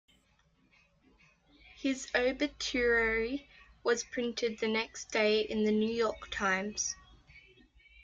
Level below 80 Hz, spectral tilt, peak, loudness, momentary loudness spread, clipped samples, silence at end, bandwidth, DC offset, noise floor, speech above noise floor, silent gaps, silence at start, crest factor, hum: -58 dBFS; -3 dB/octave; -16 dBFS; -32 LUFS; 8 LU; under 0.1%; 0.65 s; 8.8 kHz; under 0.1%; -70 dBFS; 38 dB; none; 1.8 s; 18 dB; none